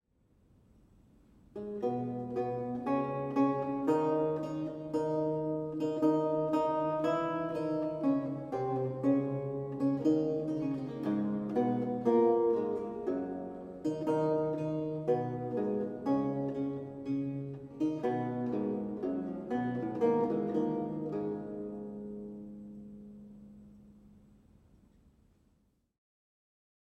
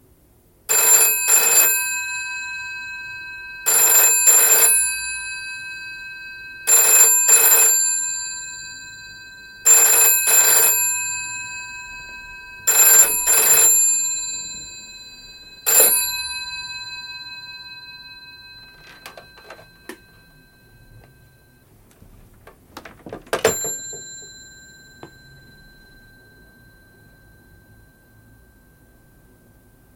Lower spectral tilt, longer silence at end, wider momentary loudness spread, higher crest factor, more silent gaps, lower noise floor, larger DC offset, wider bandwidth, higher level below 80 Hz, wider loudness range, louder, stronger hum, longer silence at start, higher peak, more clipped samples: first, -9 dB/octave vs 1.5 dB/octave; second, 2.8 s vs 4.9 s; second, 12 LU vs 24 LU; about the same, 18 dB vs 20 dB; neither; first, -73 dBFS vs -55 dBFS; neither; second, 8.6 kHz vs 17 kHz; second, -68 dBFS vs -56 dBFS; second, 7 LU vs 14 LU; second, -33 LUFS vs -13 LUFS; neither; first, 1.55 s vs 0.7 s; second, -16 dBFS vs 0 dBFS; neither